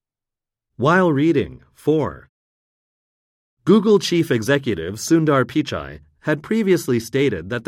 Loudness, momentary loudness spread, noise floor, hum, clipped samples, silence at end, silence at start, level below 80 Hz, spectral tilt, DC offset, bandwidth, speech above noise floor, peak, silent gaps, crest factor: -19 LUFS; 12 LU; -87 dBFS; none; under 0.1%; 0.05 s; 0.8 s; -52 dBFS; -6 dB/octave; under 0.1%; 16 kHz; 68 dB; -4 dBFS; 2.29-3.57 s; 16 dB